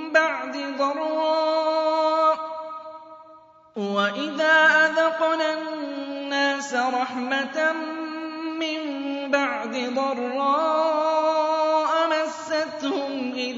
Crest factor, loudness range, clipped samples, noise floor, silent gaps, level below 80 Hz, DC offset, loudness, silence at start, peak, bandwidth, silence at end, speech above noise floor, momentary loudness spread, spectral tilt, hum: 18 dB; 4 LU; under 0.1%; -50 dBFS; none; -78 dBFS; under 0.1%; -23 LUFS; 0 s; -4 dBFS; 7.8 kHz; 0 s; 27 dB; 11 LU; -3 dB/octave; none